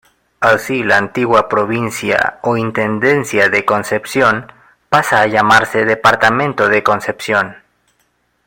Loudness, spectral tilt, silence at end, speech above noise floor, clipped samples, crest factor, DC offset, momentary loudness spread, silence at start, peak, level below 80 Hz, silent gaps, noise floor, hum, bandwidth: -13 LUFS; -4.5 dB/octave; 0.9 s; 48 dB; under 0.1%; 14 dB; under 0.1%; 6 LU; 0.4 s; 0 dBFS; -50 dBFS; none; -61 dBFS; none; 17 kHz